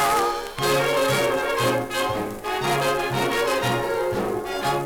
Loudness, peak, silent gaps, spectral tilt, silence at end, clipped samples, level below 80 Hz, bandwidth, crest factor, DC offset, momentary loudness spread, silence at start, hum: -23 LUFS; -10 dBFS; none; -4 dB/octave; 0 s; under 0.1%; -48 dBFS; over 20 kHz; 14 dB; under 0.1%; 5 LU; 0 s; none